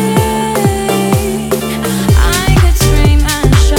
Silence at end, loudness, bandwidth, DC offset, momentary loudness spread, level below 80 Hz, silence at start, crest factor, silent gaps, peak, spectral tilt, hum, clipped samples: 0 s; -11 LUFS; 18 kHz; under 0.1%; 6 LU; -14 dBFS; 0 s; 10 dB; none; 0 dBFS; -5 dB/octave; none; under 0.1%